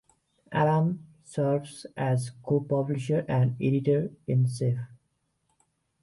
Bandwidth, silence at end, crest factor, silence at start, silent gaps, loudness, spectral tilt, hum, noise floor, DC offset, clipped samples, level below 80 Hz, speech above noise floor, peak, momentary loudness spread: 11.5 kHz; 1.1 s; 16 dB; 0.5 s; none; -28 LUFS; -8 dB/octave; none; -75 dBFS; under 0.1%; under 0.1%; -64 dBFS; 49 dB; -12 dBFS; 9 LU